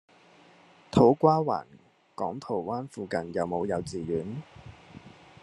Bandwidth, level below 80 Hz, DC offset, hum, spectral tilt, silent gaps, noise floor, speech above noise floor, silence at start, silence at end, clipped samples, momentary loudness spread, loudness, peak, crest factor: 11 kHz; -60 dBFS; under 0.1%; none; -7.5 dB/octave; none; -57 dBFS; 30 dB; 0.95 s; 0.35 s; under 0.1%; 18 LU; -28 LUFS; -6 dBFS; 22 dB